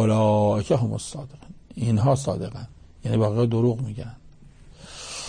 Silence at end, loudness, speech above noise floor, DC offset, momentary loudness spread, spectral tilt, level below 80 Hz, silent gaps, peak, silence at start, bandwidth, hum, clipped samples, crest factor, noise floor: 0 s; -23 LUFS; 25 dB; under 0.1%; 20 LU; -7 dB/octave; -50 dBFS; none; -10 dBFS; 0 s; 9.8 kHz; none; under 0.1%; 14 dB; -47 dBFS